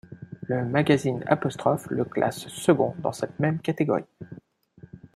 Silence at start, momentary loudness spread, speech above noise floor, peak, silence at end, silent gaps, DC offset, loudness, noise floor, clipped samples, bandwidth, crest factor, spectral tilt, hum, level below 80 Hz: 0.1 s; 16 LU; 27 dB; -4 dBFS; 0.1 s; none; under 0.1%; -25 LUFS; -52 dBFS; under 0.1%; 15 kHz; 22 dB; -6.5 dB/octave; none; -64 dBFS